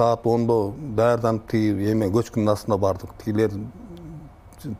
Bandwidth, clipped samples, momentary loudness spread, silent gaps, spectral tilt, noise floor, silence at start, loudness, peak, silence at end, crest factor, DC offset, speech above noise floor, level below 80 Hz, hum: 15.5 kHz; under 0.1%; 19 LU; none; -7.5 dB/octave; -42 dBFS; 0 s; -22 LUFS; -6 dBFS; 0 s; 18 dB; under 0.1%; 21 dB; -48 dBFS; none